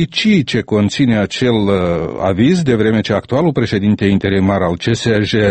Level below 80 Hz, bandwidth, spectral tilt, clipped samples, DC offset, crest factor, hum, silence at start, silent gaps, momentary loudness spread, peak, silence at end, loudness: -40 dBFS; 8.8 kHz; -6.5 dB/octave; under 0.1%; under 0.1%; 14 dB; none; 0 s; none; 3 LU; 0 dBFS; 0 s; -14 LUFS